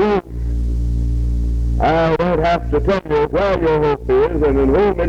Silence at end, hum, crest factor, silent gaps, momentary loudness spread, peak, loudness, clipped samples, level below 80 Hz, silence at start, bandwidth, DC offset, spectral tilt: 0 s; none; 12 dB; none; 6 LU; -4 dBFS; -17 LUFS; under 0.1%; -22 dBFS; 0 s; 6.8 kHz; under 0.1%; -8 dB/octave